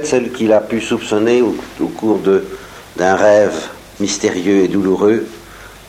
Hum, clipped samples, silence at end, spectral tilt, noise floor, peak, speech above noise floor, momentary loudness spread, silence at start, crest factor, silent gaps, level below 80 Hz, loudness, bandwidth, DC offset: none; under 0.1%; 0.05 s; -5 dB/octave; -36 dBFS; -2 dBFS; 22 dB; 16 LU; 0 s; 14 dB; none; -48 dBFS; -15 LUFS; 16 kHz; under 0.1%